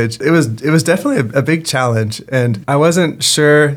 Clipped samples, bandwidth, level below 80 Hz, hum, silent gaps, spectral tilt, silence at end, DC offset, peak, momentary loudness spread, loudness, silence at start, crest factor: under 0.1%; 17.5 kHz; -54 dBFS; none; none; -5 dB/octave; 0 s; under 0.1%; 0 dBFS; 5 LU; -13 LUFS; 0 s; 14 dB